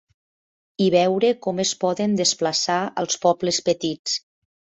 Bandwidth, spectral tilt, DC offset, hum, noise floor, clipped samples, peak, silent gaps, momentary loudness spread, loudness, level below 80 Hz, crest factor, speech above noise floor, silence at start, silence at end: 8.4 kHz; -3.5 dB/octave; under 0.1%; none; under -90 dBFS; under 0.1%; -4 dBFS; 3.99-4.05 s; 7 LU; -21 LUFS; -66 dBFS; 18 dB; over 69 dB; 0.8 s; 0.6 s